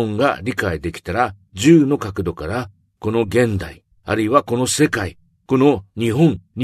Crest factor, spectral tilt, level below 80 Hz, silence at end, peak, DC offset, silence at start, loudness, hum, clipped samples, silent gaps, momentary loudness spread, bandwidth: 18 dB; -5.5 dB/octave; -44 dBFS; 0 s; 0 dBFS; under 0.1%; 0 s; -18 LUFS; none; under 0.1%; none; 13 LU; 13.5 kHz